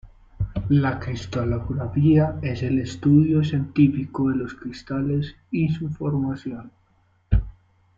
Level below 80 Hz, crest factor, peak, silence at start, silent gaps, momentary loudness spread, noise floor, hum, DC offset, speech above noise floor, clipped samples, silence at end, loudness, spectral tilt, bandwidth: -36 dBFS; 18 dB; -4 dBFS; 0.05 s; none; 12 LU; -62 dBFS; none; under 0.1%; 40 dB; under 0.1%; 0.45 s; -23 LUFS; -8.5 dB/octave; 7.4 kHz